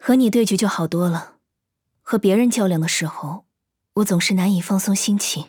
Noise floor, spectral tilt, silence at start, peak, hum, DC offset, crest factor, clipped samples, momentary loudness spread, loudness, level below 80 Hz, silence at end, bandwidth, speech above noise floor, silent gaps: -78 dBFS; -5 dB/octave; 0 s; -6 dBFS; none; under 0.1%; 14 dB; under 0.1%; 11 LU; -19 LUFS; -66 dBFS; 0.05 s; over 20 kHz; 60 dB; none